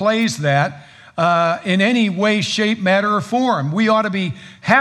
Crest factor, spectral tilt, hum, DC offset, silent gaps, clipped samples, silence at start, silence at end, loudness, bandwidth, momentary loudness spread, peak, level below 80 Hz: 16 dB; -5 dB/octave; none; under 0.1%; none; under 0.1%; 0 s; 0 s; -17 LUFS; 12.5 kHz; 7 LU; 0 dBFS; -64 dBFS